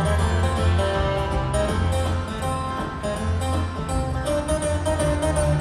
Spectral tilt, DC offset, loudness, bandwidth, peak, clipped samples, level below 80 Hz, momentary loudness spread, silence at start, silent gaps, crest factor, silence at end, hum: -5.5 dB/octave; under 0.1%; -24 LUFS; 12.5 kHz; -10 dBFS; under 0.1%; -30 dBFS; 5 LU; 0 s; none; 14 dB; 0 s; none